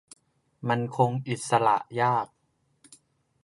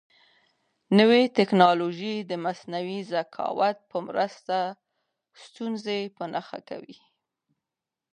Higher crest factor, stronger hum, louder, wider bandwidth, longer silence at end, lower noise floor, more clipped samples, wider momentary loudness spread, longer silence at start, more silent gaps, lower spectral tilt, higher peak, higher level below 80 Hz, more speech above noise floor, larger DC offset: about the same, 20 dB vs 24 dB; neither; about the same, -26 LUFS vs -25 LUFS; first, 11.5 kHz vs 9.6 kHz; about the same, 1.2 s vs 1.2 s; second, -63 dBFS vs -88 dBFS; neither; second, 9 LU vs 15 LU; second, 0.6 s vs 0.9 s; neither; about the same, -5.5 dB/octave vs -6.5 dB/octave; second, -8 dBFS vs -4 dBFS; first, -72 dBFS vs -78 dBFS; second, 37 dB vs 63 dB; neither